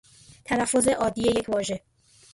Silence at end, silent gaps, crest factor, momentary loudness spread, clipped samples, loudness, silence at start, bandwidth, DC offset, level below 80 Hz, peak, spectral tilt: 0.55 s; none; 16 dB; 12 LU; under 0.1%; -24 LUFS; 0.5 s; 12 kHz; under 0.1%; -52 dBFS; -10 dBFS; -3.5 dB/octave